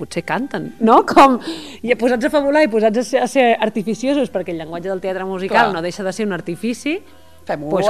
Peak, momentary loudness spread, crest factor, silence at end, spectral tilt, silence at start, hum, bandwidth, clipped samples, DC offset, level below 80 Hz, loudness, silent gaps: 0 dBFS; 13 LU; 16 dB; 0 s; -5 dB/octave; 0 s; none; 14.5 kHz; under 0.1%; 0.7%; -52 dBFS; -17 LUFS; none